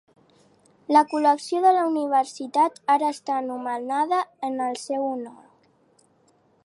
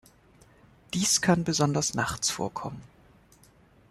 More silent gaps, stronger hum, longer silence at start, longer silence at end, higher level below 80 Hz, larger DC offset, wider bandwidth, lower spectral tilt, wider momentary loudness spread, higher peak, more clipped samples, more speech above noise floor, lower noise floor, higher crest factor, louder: neither; neither; about the same, 0.9 s vs 0.9 s; first, 1.3 s vs 1.05 s; second, -82 dBFS vs -58 dBFS; neither; second, 11.5 kHz vs 13.5 kHz; about the same, -3 dB/octave vs -3.5 dB/octave; second, 10 LU vs 15 LU; first, -4 dBFS vs -10 dBFS; neither; first, 40 dB vs 31 dB; first, -62 dBFS vs -58 dBFS; about the same, 20 dB vs 20 dB; first, -23 LUFS vs -26 LUFS